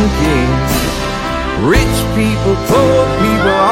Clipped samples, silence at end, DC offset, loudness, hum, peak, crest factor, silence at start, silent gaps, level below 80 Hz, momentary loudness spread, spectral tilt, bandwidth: under 0.1%; 0 s; under 0.1%; -13 LUFS; none; 0 dBFS; 12 dB; 0 s; none; -22 dBFS; 6 LU; -5.5 dB/octave; 16.5 kHz